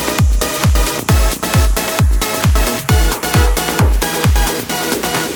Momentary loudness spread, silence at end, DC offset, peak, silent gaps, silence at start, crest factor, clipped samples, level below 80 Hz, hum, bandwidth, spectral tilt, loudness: 2 LU; 0 s; under 0.1%; 0 dBFS; none; 0 s; 12 dB; under 0.1%; -16 dBFS; none; over 20 kHz; -4 dB/octave; -14 LUFS